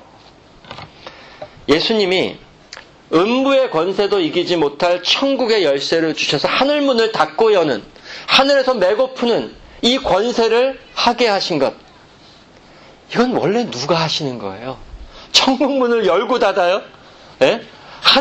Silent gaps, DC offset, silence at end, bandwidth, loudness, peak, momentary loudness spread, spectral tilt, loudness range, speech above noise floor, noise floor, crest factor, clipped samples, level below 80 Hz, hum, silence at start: none; under 0.1%; 0 s; 12 kHz; -16 LUFS; 0 dBFS; 17 LU; -4 dB/octave; 4 LU; 29 dB; -45 dBFS; 16 dB; under 0.1%; -48 dBFS; none; 0.7 s